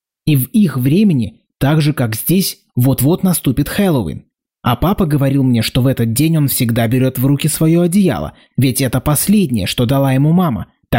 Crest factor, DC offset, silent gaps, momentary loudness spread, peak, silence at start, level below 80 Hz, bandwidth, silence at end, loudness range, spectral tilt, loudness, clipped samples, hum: 10 dB; 0.2%; none; 6 LU; -4 dBFS; 0.25 s; -36 dBFS; 16.5 kHz; 0 s; 2 LU; -6 dB/octave; -14 LUFS; under 0.1%; none